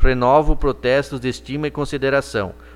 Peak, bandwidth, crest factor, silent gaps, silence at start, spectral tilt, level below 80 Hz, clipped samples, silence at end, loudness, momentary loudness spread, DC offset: 0 dBFS; 11.5 kHz; 16 dB; none; 0 s; -6 dB/octave; -24 dBFS; under 0.1%; 0 s; -20 LUFS; 10 LU; under 0.1%